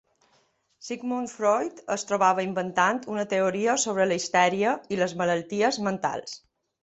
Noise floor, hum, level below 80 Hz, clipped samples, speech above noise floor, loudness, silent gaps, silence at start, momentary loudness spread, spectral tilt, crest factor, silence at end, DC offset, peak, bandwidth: -67 dBFS; none; -70 dBFS; under 0.1%; 42 dB; -25 LUFS; none; 0.8 s; 9 LU; -3.5 dB/octave; 20 dB; 0.45 s; under 0.1%; -6 dBFS; 8.2 kHz